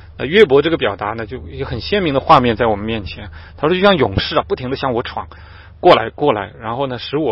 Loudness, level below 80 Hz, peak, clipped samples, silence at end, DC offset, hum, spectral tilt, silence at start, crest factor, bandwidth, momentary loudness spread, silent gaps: -16 LUFS; -38 dBFS; 0 dBFS; under 0.1%; 0 s; under 0.1%; none; -7.5 dB/octave; 0 s; 16 dB; 7 kHz; 15 LU; none